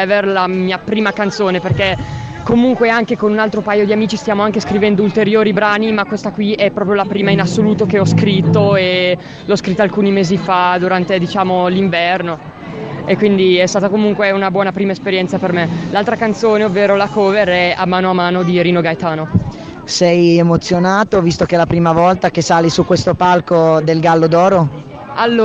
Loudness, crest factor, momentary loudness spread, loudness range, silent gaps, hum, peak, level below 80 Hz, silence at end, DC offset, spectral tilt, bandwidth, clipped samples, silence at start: -13 LUFS; 12 dB; 6 LU; 2 LU; none; none; 0 dBFS; -42 dBFS; 0 s; under 0.1%; -6 dB/octave; 8.2 kHz; under 0.1%; 0 s